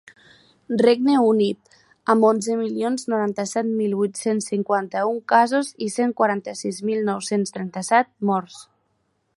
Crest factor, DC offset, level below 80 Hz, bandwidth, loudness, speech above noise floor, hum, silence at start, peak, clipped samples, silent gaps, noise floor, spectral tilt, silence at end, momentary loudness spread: 20 dB; under 0.1%; -72 dBFS; 11.5 kHz; -21 LUFS; 49 dB; none; 0.7 s; -2 dBFS; under 0.1%; none; -70 dBFS; -5 dB/octave; 0.75 s; 9 LU